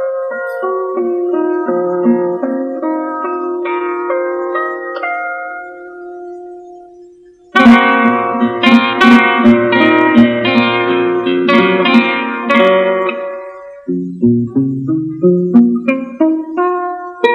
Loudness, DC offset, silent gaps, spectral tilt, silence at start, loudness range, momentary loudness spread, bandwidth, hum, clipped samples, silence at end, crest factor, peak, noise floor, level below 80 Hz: -12 LUFS; under 0.1%; none; -7 dB/octave; 0 s; 10 LU; 14 LU; 7.2 kHz; none; 0.7%; 0 s; 12 dB; 0 dBFS; -41 dBFS; -52 dBFS